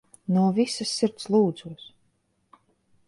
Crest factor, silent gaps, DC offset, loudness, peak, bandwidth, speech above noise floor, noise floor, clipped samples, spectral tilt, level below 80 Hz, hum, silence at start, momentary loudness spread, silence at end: 16 dB; none; under 0.1%; -24 LUFS; -10 dBFS; 11.5 kHz; 46 dB; -70 dBFS; under 0.1%; -6 dB/octave; -70 dBFS; none; 0.3 s; 18 LU; 1.3 s